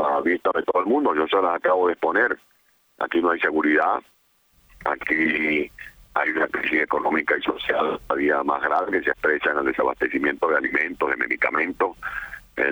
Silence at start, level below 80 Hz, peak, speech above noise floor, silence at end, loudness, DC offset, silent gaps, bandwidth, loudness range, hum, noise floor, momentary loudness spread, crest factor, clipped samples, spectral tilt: 0 s; -56 dBFS; -6 dBFS; 39 dB; 0 s; -22 LUFS; under 0.1%; none; over 20 kHz; 2 LU; none; -62 dBFS; 7 LU; 16 dB; under 0.1%; -5.5 dB/octave